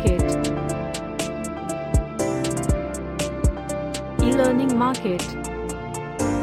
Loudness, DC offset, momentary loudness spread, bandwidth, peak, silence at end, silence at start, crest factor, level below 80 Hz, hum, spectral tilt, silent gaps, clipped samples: -24 LUFS; under 0.1%; 10 LU; 15.5 kHz; -6 dBFS; 0 s; 0 s; 16 dB; -32 dBFS; none; -5.5 dB/octave; none; under 0.1%